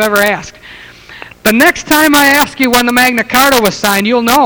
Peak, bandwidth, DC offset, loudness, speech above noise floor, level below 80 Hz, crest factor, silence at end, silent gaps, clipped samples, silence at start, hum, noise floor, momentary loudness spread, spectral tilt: 0 dBFS; over 20 kHz; 0.1%; -9 LUFS; 24 dB; -40 dBFS; 10 dB; 0 s; none; 0.9%; 0 s; none; -34 dBFS; 6 LU; -2.5 dB/octave